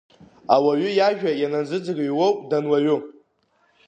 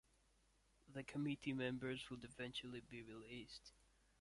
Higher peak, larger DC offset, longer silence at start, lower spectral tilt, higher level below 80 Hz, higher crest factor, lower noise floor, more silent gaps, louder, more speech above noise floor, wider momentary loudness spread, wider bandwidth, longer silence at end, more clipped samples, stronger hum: first, -2 dBFS vs -32 dBFS; neither; second, 0.5 s vs 0.85 s; about the same, -6.5 dB/octave vs -5.5 dB/octave; about the same, -74 dBFS vs -74 dBFS; about the same, 20 dB vs 20 dB; second, -65 dBFS vs -78 dBFS; neither; first, -21 LUFS vs -49 LUFS; first, 44 dB vs 29 dB; second, 7 LU vs 12 LU; second, 9 kHz vs 11.5 kHz; first, 0.75 s vs 0.5 s; neither; neither